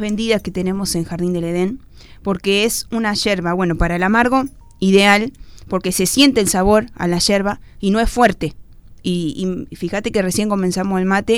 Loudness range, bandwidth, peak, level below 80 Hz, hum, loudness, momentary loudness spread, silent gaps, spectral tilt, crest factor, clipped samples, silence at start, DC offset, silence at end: 4 LU; 16.5 kHz; 0 dBFS; -34 dBFS; none; -17 LUFS; 11 LU; none; -4.5 dB/octave; 18 dB; under 0.1%; 0 s; under 0.1%; 0 s